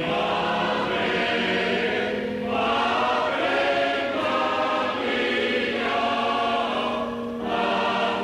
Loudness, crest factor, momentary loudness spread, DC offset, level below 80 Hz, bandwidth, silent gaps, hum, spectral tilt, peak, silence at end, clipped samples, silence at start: -23 LUFS; 12 dB; 4 LU; under 0.1%; -56 dBFS; 13 kHz; none; none; -4.5 dB/octave; -12 dBFS; 0 s; under 0.1%; 0 s